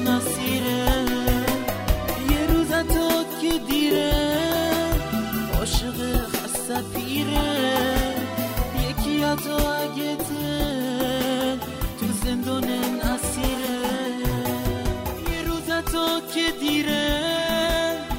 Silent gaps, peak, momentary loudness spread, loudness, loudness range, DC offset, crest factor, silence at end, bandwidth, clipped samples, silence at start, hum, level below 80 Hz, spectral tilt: none; -6 dBFS; 5 LU; -24 LUFS; 3 LU; under 0.1%; 18 dB; 0 s; 16.5 kHz; under 0.1%; 0 s; none; -32 dBFS; -4.5 dB/octave